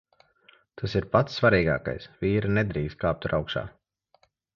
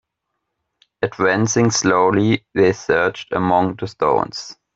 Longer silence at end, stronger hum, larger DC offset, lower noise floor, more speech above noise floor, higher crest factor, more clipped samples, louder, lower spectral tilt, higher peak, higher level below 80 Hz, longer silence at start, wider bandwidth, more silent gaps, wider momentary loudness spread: first, 0.85 s vs 0.25 s; neither; neither; second, -66 dBFS vs -77 dBFS; second, 41 dB vs 59 dB; first, 22 dB vs 16 dB; neither; second, -26 LUFS vs -18 LUFS; first, -7.5 dB/octave vs -4.5 dB/octave; second, -6 dBFS vs -2 dBFS; first, -46 dBFS vs -54 dBFS; second, 0.75 s vs 1 s; second, 7 kHz vs 8 kHz; neither; first, 12 LU vs 9 LU